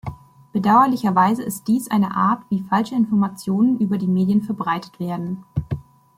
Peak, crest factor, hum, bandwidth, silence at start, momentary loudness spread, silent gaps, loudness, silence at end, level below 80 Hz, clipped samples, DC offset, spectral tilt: -2 dBFS; 18 dB; none; 16 kHz; 0.05 s; 12 LU; none; -20 LUFS; 0.35 s; -50 dBFS; under 0.1%; under 0.1%; -7 dB/octave